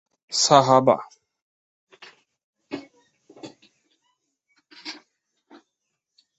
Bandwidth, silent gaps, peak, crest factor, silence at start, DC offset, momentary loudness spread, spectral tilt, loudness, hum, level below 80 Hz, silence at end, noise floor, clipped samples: 8.2 kHz; 1.42-1.87 s, 2.44-2.53 s; 0 dBFS; 26 dB; 0.3 s; under 0.1%; 29 LU; -3.5 dB/octave; -18 LUFS; none; -68 dBFS; 1.45 s; -80 dBFS; under 0.1%